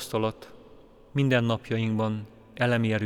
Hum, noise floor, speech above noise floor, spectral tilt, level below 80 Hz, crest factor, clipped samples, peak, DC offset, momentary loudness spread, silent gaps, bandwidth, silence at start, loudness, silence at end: none; -52 dBFS; 26 dB; -6.5 dB/octave; -58 dBFS; 18 dB; under 0.1%; -10 dBFS; under 0.1%; 12 LU; none; 16 kHz; 0 s; -27 LUFS; 0 s